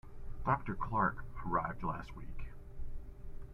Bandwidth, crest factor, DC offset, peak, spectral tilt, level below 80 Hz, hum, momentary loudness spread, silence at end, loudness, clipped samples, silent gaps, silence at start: 5.6 kHz; 20 dB; under 0.1%; -18 dBFS; -9 dB/octave; -46 dBFS; none; 19 LU; 0 s; -37 LUFS; under 0.1%; none; 0.05 s